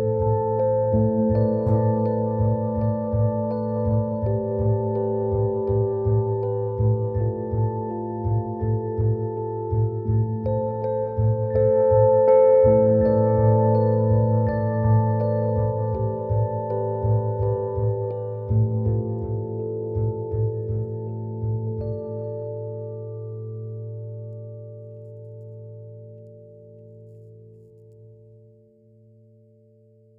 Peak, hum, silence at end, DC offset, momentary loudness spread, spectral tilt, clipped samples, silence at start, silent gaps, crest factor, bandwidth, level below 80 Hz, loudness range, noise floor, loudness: -6 dBFS; none; 2.05 s; under 0.1%; 16 LU; -14 dB/octave; under 0.1%; 0 s; none; 16 dB; 2.3 kHz; -44 dBFS; 17 LU; -54 dBFS; -23 LUFS